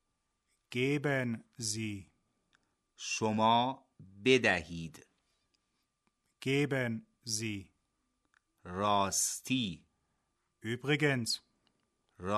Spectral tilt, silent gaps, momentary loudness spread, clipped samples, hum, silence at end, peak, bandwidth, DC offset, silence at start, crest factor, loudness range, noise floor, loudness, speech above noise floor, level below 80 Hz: -4 dB/octave; none; 16 LU; under 0.1%; none; 0 s; -14 dBFS; 13.5 kHz; under 0.1%; 0.7 s; 22 dB; 5 LU; -82 dBFS; -33 LUFS; 49 dB; -68 dBFS